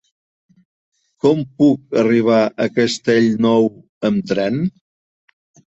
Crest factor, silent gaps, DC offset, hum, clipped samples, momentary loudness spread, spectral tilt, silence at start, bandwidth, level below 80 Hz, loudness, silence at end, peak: 16 dB; 3.89-4.01 s; under 0.1%; none; under 0.1%; 6 LU; -6.5 dB/octave; 1.25 s; 8.2 kHz; -58 dBFS; -17 LUFS; 1.1 s; -2 dBFS